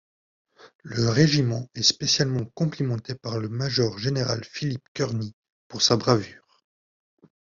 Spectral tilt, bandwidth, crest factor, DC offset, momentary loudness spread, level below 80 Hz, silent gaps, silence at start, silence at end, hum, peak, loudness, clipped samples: -4.5 dB/octave; 7.6 kHz; 22 dB; under 0.1%; 12 LU; -58 dBFS; 0.75-0.79 s, 4.88-4.95 s, 5.33-5.43 s, 5.49-5.70 s; 0.65 s; 1.15 s; none; -4 dBFS; -24 LUFS; under 0.1%